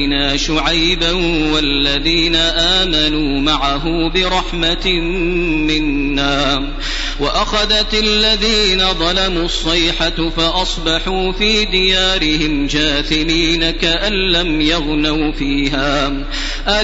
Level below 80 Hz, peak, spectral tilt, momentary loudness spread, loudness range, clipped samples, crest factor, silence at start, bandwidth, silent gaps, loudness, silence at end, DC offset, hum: -24 dBFS; -2 dBFS; -3.5 dB/octave; 5 LU; 2 LU; under 0.1%; 14 dB; 0 s; 8 kHz; none; -14 LUFS; 0 s; under 0.1%; none